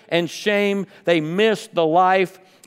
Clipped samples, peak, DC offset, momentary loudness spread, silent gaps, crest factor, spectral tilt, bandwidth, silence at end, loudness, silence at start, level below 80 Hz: under 0.1%; -4 dBFS; under 0.1%; 6 LU; none; 16 dB; -5 dB/octave; 16 kHz; 0.35 s; -19 LUFS; 0.1 s; -76 dBFS